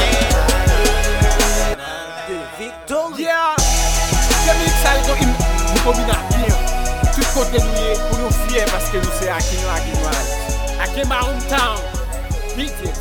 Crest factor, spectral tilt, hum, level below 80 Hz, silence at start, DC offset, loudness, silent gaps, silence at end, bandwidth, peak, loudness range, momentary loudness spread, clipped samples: 14 dB; -3.5 dB/octave; none; -20 dBFS; 0 s; under 0.1%; -18 LUFS; none; 0 s; 18 kHz; -2 dBFS; 4 LU; 10 LU; under 0.1%